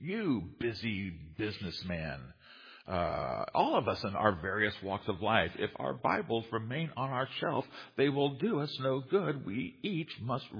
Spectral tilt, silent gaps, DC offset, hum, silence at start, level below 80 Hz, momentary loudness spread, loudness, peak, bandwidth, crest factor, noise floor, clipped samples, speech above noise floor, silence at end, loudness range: -4 dB/octave; none; under 0.1%; none; 0 s; -60 dBFS; 9 LU; -34 LUFS; -10 dBFS; 5.2 kHz; 24 dB; -56 dBFS; under 0.1%; 22 dB; 0 s; 4 LU